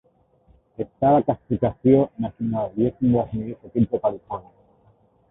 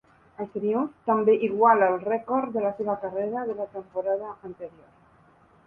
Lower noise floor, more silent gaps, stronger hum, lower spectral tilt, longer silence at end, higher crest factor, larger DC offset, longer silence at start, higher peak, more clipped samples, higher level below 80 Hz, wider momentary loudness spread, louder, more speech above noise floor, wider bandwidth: about the same, -59 dBFS vs -58 dBFS; neither; neither; first, -13.5 dB/octave vs -9.5 dB/octave; about the same, 0.9 s vs 0.95 s; about the same, 18 dB vs 20 dB; neither; first, 0.8 s vs 0.4 s; about the same, -4 dBFS vs -6 dBFS; neither; first, -50 dBFS vs -68 dBFS; about the same, 16 LU vs 18 LU; first, -22 LUFS vs -25 LUFS; first, 37 dB vs 33 dB; first, 3.9 kHz vs 3.4 kHz